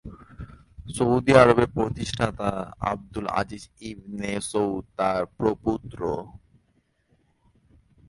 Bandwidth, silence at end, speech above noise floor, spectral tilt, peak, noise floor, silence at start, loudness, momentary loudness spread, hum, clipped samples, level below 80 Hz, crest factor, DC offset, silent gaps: 11.5 kHz; 1.7 s; 43 dB; -6 dB/octave; -2 dBFS; -68 dBFS; 0.05 s; -24 LUFS; 22 LU; none; under 0.1%; -48 dBFS; 24 dB; under 0.1%; none